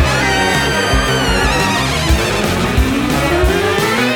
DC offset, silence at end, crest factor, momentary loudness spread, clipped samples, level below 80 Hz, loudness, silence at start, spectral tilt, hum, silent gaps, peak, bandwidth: under 0.1%; 0 s; 12 dB; 2 LU; under 0.1%; -22 dBFS; -14 LUFS; 0 s; -4 dB/octave; none; none; 0 dBFS; 19 kHz